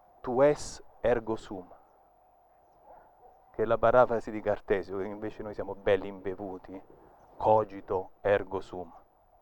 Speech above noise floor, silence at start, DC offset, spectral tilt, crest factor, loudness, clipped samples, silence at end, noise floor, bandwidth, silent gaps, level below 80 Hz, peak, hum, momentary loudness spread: 33 dB; 0.25 s; under 0.1%; -6 dB/octave; 22 dB; -30 LUFS; under 0.1%; 0.45 s; -63 dBFS; 17.5 kHz; none; -52 dBFS; -10 dBFS; none; 18 LU